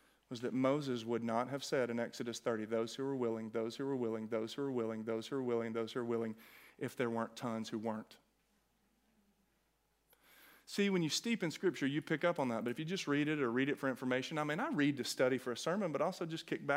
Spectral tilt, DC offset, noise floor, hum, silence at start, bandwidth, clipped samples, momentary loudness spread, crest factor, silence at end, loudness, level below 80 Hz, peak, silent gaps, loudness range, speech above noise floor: -5 dB/octave; under 0.1%; -78 dBFS; none; 0.3 s; 16 kHz; under 0.1%; 6 LU; 20 dB; 0 s; -38 LUFS; -84 dBFS; -18 dBFS; none; 8 LU; 41 dB